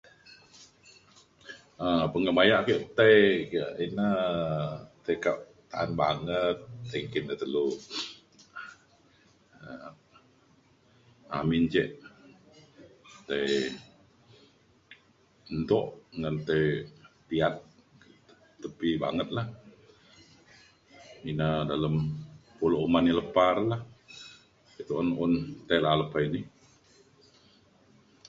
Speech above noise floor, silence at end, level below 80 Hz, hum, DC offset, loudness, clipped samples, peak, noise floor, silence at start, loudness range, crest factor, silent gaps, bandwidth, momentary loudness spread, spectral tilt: 36 dB; 1.8 s; -58 dBFS; none; under 0.1%; -28 LUFS; under 0.1%; -6 dBFS; -63 dBFS; 0.6 s; 11 LU; 24 dB; none; 7.8 kHz; 21 LU; -6.5 dB/octave